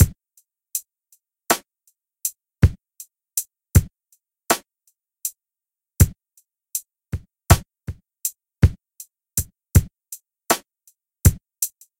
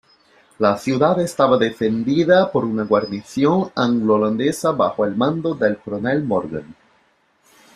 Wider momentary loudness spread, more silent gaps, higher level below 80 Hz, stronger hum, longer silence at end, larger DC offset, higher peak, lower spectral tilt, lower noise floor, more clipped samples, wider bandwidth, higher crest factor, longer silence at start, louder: first, 19 LU vs 6 LU; neither; first, -30 dBFS vs -58 dBFS; neither; second, 0.3 s vs 1.05 s; neither; about the same, 0 dBFS vs -2 dBFS; second, -4.5 dB/octave vs -6.5 dB/octave; first, -89 dBFS vs -60 dBFS; neither; first, 17 kHz vs 13.5 kHz; first, 24 dB vs 18 dB; second, 0 s vs 0.6 s; second, -23 LUFS vs -19 LUFS